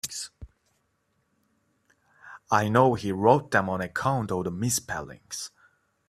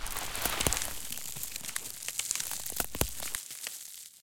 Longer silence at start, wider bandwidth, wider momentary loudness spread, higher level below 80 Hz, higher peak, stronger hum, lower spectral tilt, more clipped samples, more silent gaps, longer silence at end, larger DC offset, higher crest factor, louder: about the same, 0.05 s vs 0 s; about the same, 16 kHz vs 17 kHz; first, 15 LU vs 9 LU; second, -58 dBFS vs -48 dBFS; about the same, -4 dBFS vs -6 dBFS; neither; first, -4.5 dB/octave vs -1.5 dB/octave; neither; neither; first, 0.6 s vs 0 s; second, under 0.1% vs 0.6%; second, 24 dB vs 30 dB; first, -26 LUFS vs -34 LUFS